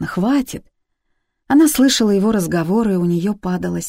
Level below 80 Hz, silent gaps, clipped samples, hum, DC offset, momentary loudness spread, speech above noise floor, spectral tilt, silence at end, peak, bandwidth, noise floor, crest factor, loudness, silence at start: -46 dBFS; none; under 0.1%; none; under 0.1%; 9 LU; 53 dB; -5 dB/octave; 0 s; -4 dBFS; 16.5 kHz; -69 dBFS; 12 dB; -16 LUFS; 0 s